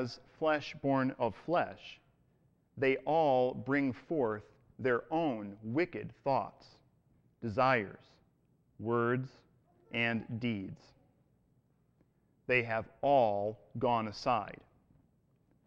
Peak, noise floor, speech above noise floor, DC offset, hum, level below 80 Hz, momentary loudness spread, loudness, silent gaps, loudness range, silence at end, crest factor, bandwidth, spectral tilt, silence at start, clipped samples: -16 dBFS; -72 dBFS; 38 dB; under 0.1%; none; -68 dBFS; 14 LU; -33 LUFS; none; 4 LU; 1.1 s; 20 dB; 7.8 kHz; -7 dB/octave; 0 s; under 0.1%